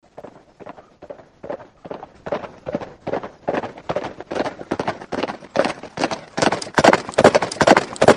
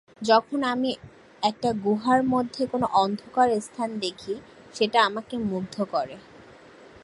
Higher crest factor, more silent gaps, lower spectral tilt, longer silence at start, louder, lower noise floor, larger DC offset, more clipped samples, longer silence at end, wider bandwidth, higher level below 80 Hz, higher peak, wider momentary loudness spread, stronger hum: about the same, 20 dB vs 20 dB; neither; about the same, -4.5 dB/octave vs -5 dB/octave; about the same, 0.2 s vs 0.2 s; first, -20 LUFS vs -25 LUFS; second, -42 dBFS vs -49 dBFS; neither; first, 0.1% vs under 0.1%; second, 0 s vs 0.6 s; first, 13.5 kHz vs 11.5 kHz; first, -52 dBFS vs -62 dBFS; first, 0 dBFS vs -6 dBFS; first, 22 LU vs 14 LU; neither